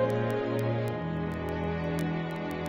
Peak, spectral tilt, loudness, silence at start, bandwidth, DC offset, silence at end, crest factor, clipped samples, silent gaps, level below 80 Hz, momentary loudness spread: -16 dBFS; -7.5 dB/octave; -31 LUFS; 0 s; 16 kHz; under 0.1%; 0 s; 14 dB; under 0.1%; none; -50 dBFS; 3 LU